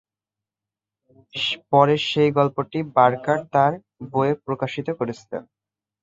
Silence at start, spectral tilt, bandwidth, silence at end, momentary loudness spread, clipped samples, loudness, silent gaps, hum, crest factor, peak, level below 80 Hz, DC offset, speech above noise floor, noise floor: 1.35 s; -6.5 dB/octave; 7.8 kHz; 0.6 s; 14 LU; under 0.1%; -21 LUFS; none; none; 20 dB; -2 dBFS; -64 dBFS; under 0.1%; 68 dB; -89 dBFS